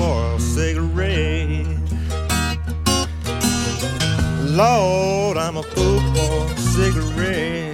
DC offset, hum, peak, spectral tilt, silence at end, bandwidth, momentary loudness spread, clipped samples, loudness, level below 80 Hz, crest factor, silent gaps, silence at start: under 0.1%; none; -2 dBFS; -5 dB/octave; 0 s; 17 kHz; 6 LU; under 0.1%; -20 LUFS; -26 dBFS; 16 dB; none; 0 s